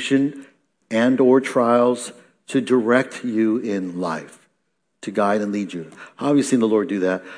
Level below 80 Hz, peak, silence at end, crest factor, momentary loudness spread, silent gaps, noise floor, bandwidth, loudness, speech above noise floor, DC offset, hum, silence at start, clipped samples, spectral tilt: -76 dBFS; -4 dBFS; 0 s; 16 dB; 11 LU; none; -73 dBFS; 10.5 kHz; -20 LUFS; 53 dB; under 0.1%; none; 0 s; under 0.1%; -5.5 dB/octave